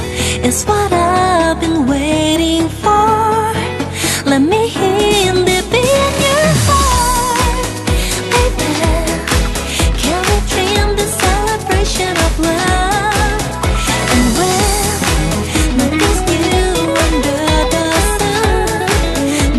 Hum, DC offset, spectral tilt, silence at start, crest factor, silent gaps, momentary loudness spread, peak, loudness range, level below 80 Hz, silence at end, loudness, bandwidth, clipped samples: none; under 0.1%; -4 dB/octave; 0 s; 12 dB; none; 4 LU; 0 dBFS; 2 LU; -20 dBFS; 0 s; -13 LUFS; 12.5 kHz; under 0.1%